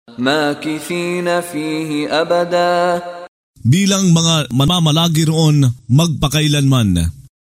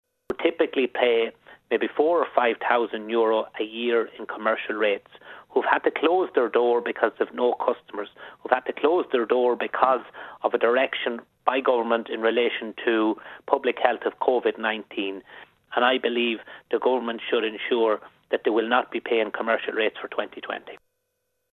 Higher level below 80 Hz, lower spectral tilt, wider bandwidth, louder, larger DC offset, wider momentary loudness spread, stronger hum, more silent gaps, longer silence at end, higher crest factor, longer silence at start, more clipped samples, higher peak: first, -38 dBFS vs -72 dBFS; second, -5 dB/octave vs -6.5 dB/octave; first, 16 kHz vs 4.2 kHz; first, -15 LUFS vs -24 LUFS; neither; about the same, 8 LU vs 9 LU; neither; first, 3.28-3.54 s vs none; second, 0.25 s vs 0.85 s; second, 12 dB vs 22 dB; second, 0.1 s vs 0.3 s; neither; about the same, -2 dBFS vs -2 dBFS